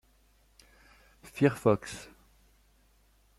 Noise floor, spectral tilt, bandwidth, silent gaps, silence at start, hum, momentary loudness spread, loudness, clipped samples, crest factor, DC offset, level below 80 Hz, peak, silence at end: -65 dBFS; -6.5 dB/octave; 14.5 kHz; none; 1.35 s; none; 21 LU; -29 LUFS; under 0.1%; 24 dB; under 0.1%; -62 dBFS; -10 dBFS; 1.35 s